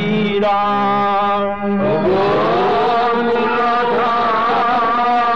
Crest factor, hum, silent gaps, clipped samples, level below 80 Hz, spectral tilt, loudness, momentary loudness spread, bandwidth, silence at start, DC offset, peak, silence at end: 8 dB; none; none; under 0.1%; -48 dBFS; -7 dB/octave; -15 LUFS; 2 LU; 7.8 kHz; 0 s; 2%; -8 dBFS; 0 s